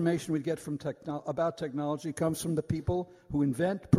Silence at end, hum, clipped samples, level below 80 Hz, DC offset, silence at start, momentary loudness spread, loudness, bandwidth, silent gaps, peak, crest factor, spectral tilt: 0 s; none; under 0.1%; -56 dBFS; under 0.1%; 0 s; 7 LU; -32 LUFS; 15.5 kHz; none; -8 dBFS; 22 dB; -7 dB/octave